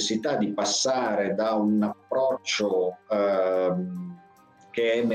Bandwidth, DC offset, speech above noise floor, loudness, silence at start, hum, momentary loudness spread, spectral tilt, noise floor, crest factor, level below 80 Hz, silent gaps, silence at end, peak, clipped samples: 10 kHz; under 0.1%; 30 dB; -25 LUFS; 0 s; none; 6 LU; -4 dB/octave; -55 dBFS; 10 dB; -72 dBFS; none; 0 s; -16 dBFS; under 0.1%